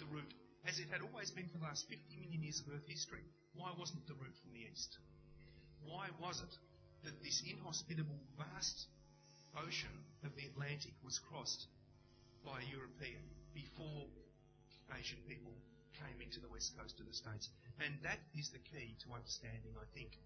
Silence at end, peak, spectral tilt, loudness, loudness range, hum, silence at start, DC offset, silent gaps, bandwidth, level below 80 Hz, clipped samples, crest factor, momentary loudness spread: 0 s; -26 dBFS; -3 dB/octave; -49 LUFS; 6 LU; none; 0 s; under 0.1%; none; 6.6 kHz; -68 dBFS; under 0.1%; 24 dB; 17 LU